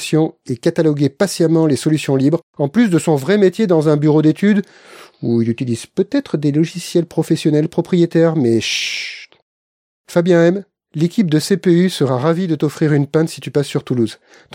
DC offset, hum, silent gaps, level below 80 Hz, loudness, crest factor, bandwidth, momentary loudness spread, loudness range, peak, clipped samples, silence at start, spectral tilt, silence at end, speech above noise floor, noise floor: under 0.1%; none; 2.43-2.53 s, 9.42-10.04 s; -62 dBFS; -16 LUFS; 14 dB; 16 kHz; 7 LU; 3 LU; -2 dBFS; under 0.1%; 0 s; -6.5 dB/octave; 0.4 s; over 75 dB; under -90 dBFS